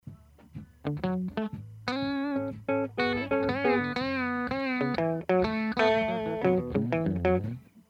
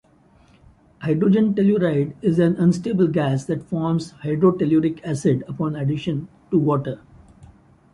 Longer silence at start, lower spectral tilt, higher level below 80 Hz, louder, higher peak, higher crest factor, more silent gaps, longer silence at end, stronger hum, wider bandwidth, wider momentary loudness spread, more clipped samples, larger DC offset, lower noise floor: second, 0.05 s vs 1 s; about the same, -7.5 dB/octave vs -8 dB/octave; about the same, -54 dBFS vs -54 dBFS; second, -29 LUFS vs -21 LUFS; second, -10 dBFS vs -4 dBFS; about the same, 18 dB vs 16 dB; neither; second, 0.1 s vs 0.5 s; neither; second, 8.6 kHz vs 11.5 kHz; about the same, 10 LU vs 9 LU; neither; neither; second, -49 dBFS vs -54 dBFS